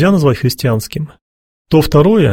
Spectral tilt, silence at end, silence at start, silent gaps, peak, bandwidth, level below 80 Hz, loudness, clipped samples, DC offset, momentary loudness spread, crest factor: -7 dB/octave; 0 s; 0 s; 1.21-1.65 s; 0 dBFS; 16.5 kHz; -34 dBFS; -13 LUFS; under 0.1%; under 0.1%; 14 LU; 12 dB